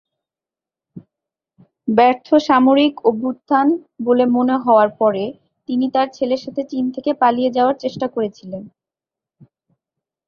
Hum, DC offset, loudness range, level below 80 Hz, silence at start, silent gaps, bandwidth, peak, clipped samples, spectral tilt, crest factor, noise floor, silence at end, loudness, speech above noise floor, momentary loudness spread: none; under 0.1%; 6 LU; -64 dBFS; 0.95 s; none; 6.8 kHz; -2 dBFS; under 0.1%; -6.5 dB/octave; 16 dB; -89 dBFS; 1.6 s; -17 LUFS; 73 dB; 11 LU